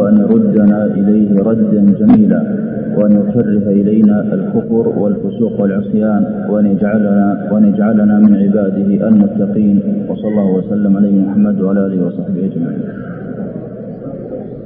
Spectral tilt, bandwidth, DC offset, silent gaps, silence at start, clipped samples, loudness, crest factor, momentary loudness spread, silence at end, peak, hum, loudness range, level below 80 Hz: -15 dB/octave; 3.3 kHz; under 0.1%; none; 0 s; under 0.1%; -12 LUFS; 12 dB; 14 LU; 0 s; 0 dBFS; none; 4 LU; -48 dBFS